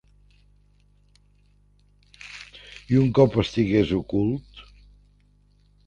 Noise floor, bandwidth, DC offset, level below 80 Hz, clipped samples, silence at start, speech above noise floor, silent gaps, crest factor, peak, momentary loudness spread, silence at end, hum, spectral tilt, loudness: -59 dBFS; 9.2 kHz; under 0.1%; -48 dBFS; under 0.1%; 2.25 s; 39 dB; none; 22 dB; -4 dBFS; 22 LU; 1.25 s; 50 Hz at -50 dBFS; -8 dB/octave; -22 LUFS